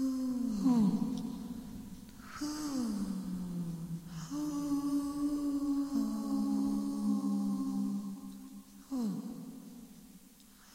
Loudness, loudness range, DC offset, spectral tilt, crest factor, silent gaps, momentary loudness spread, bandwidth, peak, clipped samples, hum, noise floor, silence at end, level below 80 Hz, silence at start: -35 LUFS; 6 LU; under 0.1%; -6.5 dB/octave; 16 dB; none; 17 LU; 16 kHz; -20 dBFS; under 0.1%; none; -59 dBFS; 0 s; -60 dBFS; 0 s